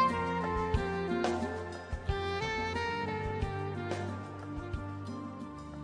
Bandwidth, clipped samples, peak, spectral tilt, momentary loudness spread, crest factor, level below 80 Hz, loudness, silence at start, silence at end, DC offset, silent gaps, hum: 10.5 kHz; under 0.1%; -14 dBFS; -6 dB/octave; 9 LU; 20 dB; -46 dBFS; -35 LUFS; 0 s; 0 s; under 0.1%; none; none